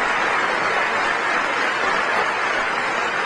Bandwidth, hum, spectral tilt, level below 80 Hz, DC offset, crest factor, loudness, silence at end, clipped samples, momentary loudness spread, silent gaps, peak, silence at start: 11 kHz; none; -2 dB/octave; -54 dBFS; under 0.1%; 14 dB; -19 LUFS; 0 s; under 0.1%; 2 LU; none; -6 dBFS; 0 s